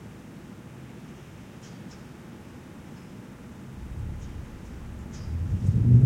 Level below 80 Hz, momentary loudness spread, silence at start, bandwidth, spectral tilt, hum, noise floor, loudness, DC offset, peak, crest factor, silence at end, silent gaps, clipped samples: -42 dBFS; 17 LU; 0 s; 8.8 kHz; -8.5 dB/octave; none; -44 dBFS; -32 LUFS; under 0.1%; -6 dBFS; 22 dB; 0 s; none; under 0.1%